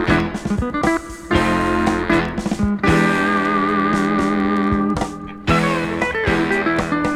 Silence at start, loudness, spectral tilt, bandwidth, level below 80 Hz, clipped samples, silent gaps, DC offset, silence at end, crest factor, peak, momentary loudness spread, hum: 0 s; -18 LUFS; -6 dB/octave; 14 kHz; -34 dBFS; under 0.1%; none; under 0.1%; 0 s; 16 dB; -2 dBFS; 6 LU; none